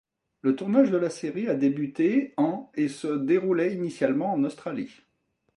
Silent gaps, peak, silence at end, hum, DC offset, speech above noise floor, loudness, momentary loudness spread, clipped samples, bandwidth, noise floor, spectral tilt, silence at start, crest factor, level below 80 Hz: none; -8 dBFS; 0.7 s; none; under 0.1%; 49 dB; -26 LUFS; 8 LU; under 0.1%; 11 kHz; -74 dBFS; -7 dB/octave; 0.45 s; 18 dB; -74 dBFS